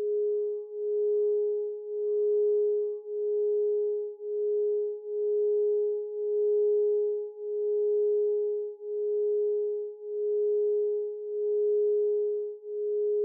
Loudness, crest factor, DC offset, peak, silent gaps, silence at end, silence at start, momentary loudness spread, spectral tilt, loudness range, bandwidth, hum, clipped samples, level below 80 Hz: -29 LUFS; 6 dB; under 0.1%; -22 dBFS; none; 0 s; 0 s; 8 LU; -10 dB/octave; 1 LU; 0.9 kHz; none; under 0.1%; under -90 dBFS